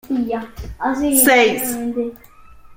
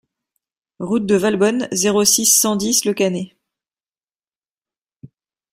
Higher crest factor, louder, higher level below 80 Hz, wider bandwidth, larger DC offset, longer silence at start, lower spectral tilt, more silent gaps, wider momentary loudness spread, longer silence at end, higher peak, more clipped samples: about the same, 18 dB vs 18 dB; about the same, -16 LUFS vs -15 LUFS; first, -42 dBFS vs -60 dBFS; about the same, 16.5 kHz vs 16 kHz; neither; second, 0.05 s vs 0.8 s; about the same, -2.5 dB/octave vs -3 dB/octave; second, none vs 4.96-5.00 s; first, 15 LU vs 12 LU; second, 0 s vs 0.45 s; about the same, 0 dBFS vs -2 dBFS; neither